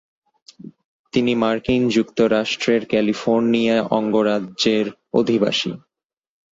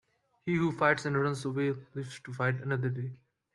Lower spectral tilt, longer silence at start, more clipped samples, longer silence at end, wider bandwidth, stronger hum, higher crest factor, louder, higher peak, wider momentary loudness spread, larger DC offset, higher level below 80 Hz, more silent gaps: second, -5 dB/octave vs -6.5 dB/octave; first, 0.65 s vs 0.45 s; neither; first, 0.75 s vs 0.4 s; second, 7.8 kHz vs 11.5 kHz; neither; second, 16 dB vs 22 dB; first, -19 LUFS vs -31 LUFS; first, -4 dBFS vs -12 dBFS; second, 4 LU vs 14 LU; neither; first, -52 dBFS vs -70 dBFS; first, 0.85-1.04 s vs none